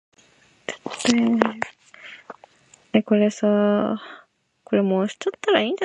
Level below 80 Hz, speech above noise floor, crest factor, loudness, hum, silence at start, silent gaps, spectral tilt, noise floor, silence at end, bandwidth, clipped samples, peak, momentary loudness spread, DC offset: -66 dBFS; 37 dB; 22 dB; -22 LUFS; none; 0.7 s; none; -5 dB/octave; -57 dBFS; 0 s; 11 kHz; under 0.1%; 0 dBFS; 22 LU; under 0.1%